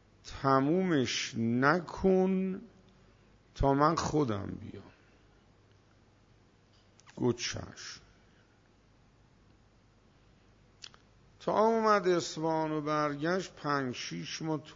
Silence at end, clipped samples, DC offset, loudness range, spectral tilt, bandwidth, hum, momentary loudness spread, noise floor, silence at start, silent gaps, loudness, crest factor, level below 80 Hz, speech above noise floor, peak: 0 s; under 0.1%; under 0.1%; 10 LU; -5.5 dB/octave; 7.8 kHz; none; 19 LU; -64 dBFS; 0.25 s; none; -31 LUFS; 22 dB; -54 dBFS; 34 dB; -12 dBFS